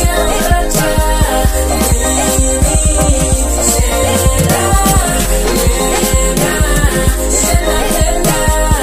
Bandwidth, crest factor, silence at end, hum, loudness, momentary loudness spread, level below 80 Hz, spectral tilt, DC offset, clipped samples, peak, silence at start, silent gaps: 15.5 kHz; 10 dB; 0 s; none; -12 LUFS; 2 LU; -14 dBFS; -4 dB/octave; 0.3%; under 0.1%; 0 dBFS; 0 s; none